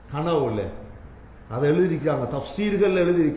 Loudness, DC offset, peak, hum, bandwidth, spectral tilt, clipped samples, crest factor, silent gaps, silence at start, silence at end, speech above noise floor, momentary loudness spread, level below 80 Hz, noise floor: -23 LUFS; under 0.1%; -10 dBFS; none; 4 kHz; -11.5 dB/octave; under 0.1%; 14 dB; none; 0.05 s; 0 s; 21 dB; 14 LU; -46 dBFS; -43 dBFS